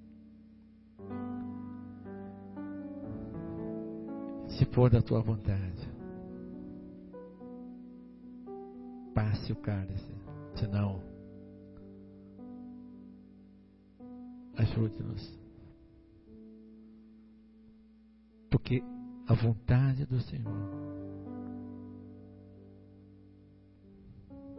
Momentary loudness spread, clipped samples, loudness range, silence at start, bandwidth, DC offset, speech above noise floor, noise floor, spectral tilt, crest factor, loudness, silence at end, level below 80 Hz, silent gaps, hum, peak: 25 LU; under 0.1%; 15 LU; 0 s; 5.6 kHz; under 0.1%; 30 dB; -60 dBFS; -8.5 dB/octave; 24 dB; -35 LUFS; 0 s; -52 dBFS; none; none; -12 dBFS